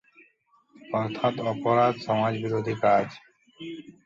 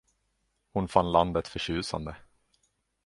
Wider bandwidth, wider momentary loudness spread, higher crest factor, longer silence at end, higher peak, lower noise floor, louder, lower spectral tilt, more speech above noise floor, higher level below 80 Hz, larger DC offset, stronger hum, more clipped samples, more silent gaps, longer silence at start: second, 7.6 kHz vs 11.5 kHz; first, 17 LU vs 12 LU; second, 18 dB vs 26 dB; second, 0.15 s vs 0.9 s; second, -10 dBFS vs -6 dBFS; second, -64 dBFS vs -76 dBFS; first, -26 LUFS vs -29 LUFS; first, -7.5 dB/octave vs -5.5 dB/octave; second, 39 dB vs 48 dB; second, -66 dBFS vs -50 dBFS; neither; neither; neither; neither; about the same, 0.85 s vs 0.75 s